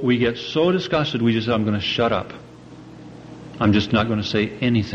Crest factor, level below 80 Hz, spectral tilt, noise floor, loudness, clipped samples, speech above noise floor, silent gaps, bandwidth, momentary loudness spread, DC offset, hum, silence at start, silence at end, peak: 14 dB; -48 dBFS; -6.5 dB/octave; -41 dBFS; -20 LUFS; under 0.1%; 21 dB; none; 7.4 kHz; 21 LU; under 0.1%; none; 0 s; 0 s; -6 dBFS